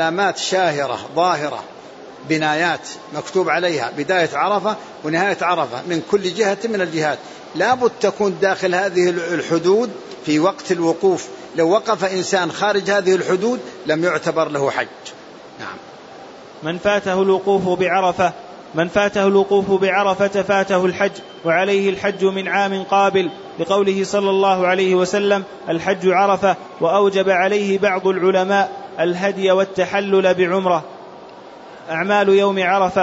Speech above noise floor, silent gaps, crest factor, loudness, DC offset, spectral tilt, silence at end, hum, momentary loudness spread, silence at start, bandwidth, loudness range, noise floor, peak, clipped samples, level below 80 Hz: 21 dB; none; 14 dB; -18 LUFS; under 0.1%; -5 dB/octave; 0 s; none; 12 LU; 0 s; 8 kHz; 3 LU; -38 dBFS; -2 dBFS; under 0.1%; -58 dBFS